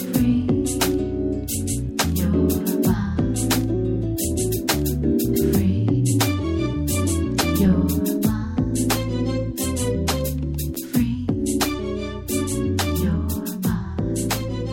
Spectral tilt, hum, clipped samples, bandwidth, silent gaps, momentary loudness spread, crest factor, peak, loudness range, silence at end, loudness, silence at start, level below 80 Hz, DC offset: -5.5 dB/octave; none; under 0.1%; 17 kHz; none; 5 LU; 18 dB; -4 dBFS; 3 LU; 0 s; -22 LUFS; 0 s; -32 dBFS; under 0.1%